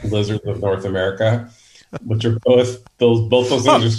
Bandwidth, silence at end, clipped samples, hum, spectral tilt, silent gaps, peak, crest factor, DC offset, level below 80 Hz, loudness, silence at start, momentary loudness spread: 11.5 kHz; 0 s; under 0.1%; none; -6 dB/octave; none; 0 dBFS; 16 dB; under 0.1%; -48 dBFS; -18 LUFS; 0 s; 9 LU